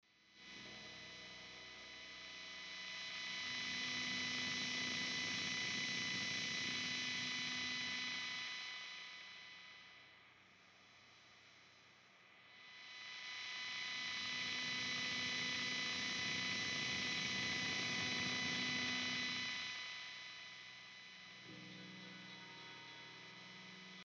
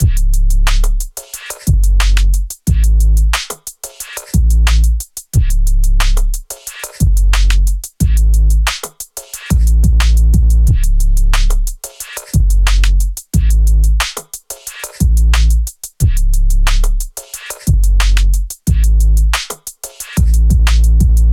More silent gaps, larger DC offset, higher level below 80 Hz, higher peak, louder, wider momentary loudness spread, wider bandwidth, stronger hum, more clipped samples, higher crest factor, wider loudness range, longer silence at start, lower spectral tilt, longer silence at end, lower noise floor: neither; neither; second, -80 dBFS vs -12 dBFS; second, -30 dBFS vs -2 dBFS; second, -41 LUFS vs -14 LUFS; first, 16 LU vs 13 LU; second, 11 kHz vs 15.5 kHz; neither; neither; first, 16 dB vs 8 dB; first, 14 LU vs 2 LU; first, 0.25 s vs 0 s; second, -1.5 dB/octave vs -4.5 dB/octave; about the same, 0 s vs 0 s; first, -66 dBFS vs -29 dBFS